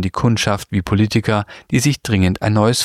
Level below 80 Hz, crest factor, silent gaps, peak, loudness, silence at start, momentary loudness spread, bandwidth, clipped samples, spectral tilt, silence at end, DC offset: -40 dBFS; 16 dB; none; 0 dBFS; -17 LUFS; 0 s; 5 LU; 15 kHz; under 0.1%; -5.5 dB/octave; 0 s; under 0.1%